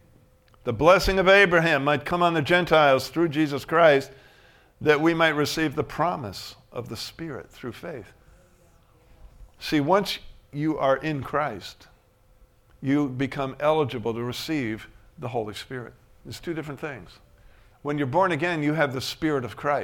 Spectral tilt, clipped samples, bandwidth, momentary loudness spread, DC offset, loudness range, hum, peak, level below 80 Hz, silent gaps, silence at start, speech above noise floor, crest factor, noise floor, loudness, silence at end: -5.5 dB/octave; under 0.1%; 17.5 kHz; 19 LU; under 0.1%; 13 LU; none; -4 dBFS; -48 dBFS; none; 0.65 s; 34 dB; 22 dB; -58 dBFS; -23 LUFS; 0 s